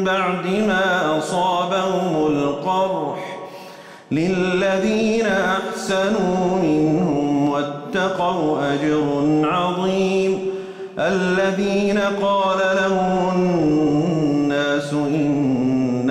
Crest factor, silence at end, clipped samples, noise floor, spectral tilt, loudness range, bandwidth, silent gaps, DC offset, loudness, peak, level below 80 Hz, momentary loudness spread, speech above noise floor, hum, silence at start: 8 dB; 0 s; under 0.1%; -39 dBFS; -6 dB/octave; 3 LU; 13 kHz; none; under 0.1%; -19 LUFS; -10 dBFS; -52 dBFS; 5 LU; 21 dB; none; 0 s